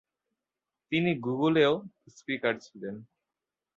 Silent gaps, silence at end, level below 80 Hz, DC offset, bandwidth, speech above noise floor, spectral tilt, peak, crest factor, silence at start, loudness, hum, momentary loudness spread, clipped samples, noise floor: none; 0.75 s; -72 dBFS; under 0.1%; 7.6 kHz; 61 dB; -6.5 dB/octave; -10 dBFS; 20 dB; 0.9 s; -28 LUFS; none; 17 LU; under 0.1%; -89 dBFS